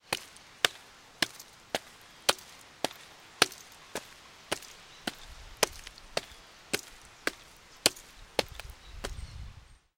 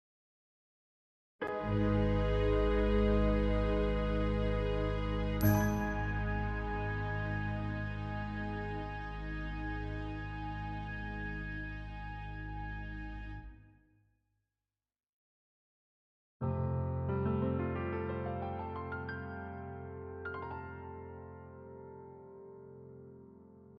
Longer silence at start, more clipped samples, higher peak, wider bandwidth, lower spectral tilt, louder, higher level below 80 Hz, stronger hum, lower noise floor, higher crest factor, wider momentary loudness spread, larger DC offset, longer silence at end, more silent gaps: second, 0.1 s vs 1.4 s; neither; first, -2 dBFS vs -18 dBFS; first, 17 kHz vs 13 kHz; second, -1 dB/octave vs -7.5 dB/octave; first, -33 LUFS vs -36 LUFS; second, -54 dBFS vs -42 dBFS; neither; second, -54 dBFS vs under -90 dBFS; first, 36 dB vs 18 dB; about the same, 21 LU vs 19 LU; neither; first, 0.25 s vs 0 s; second, none vs 15.09-16.40 s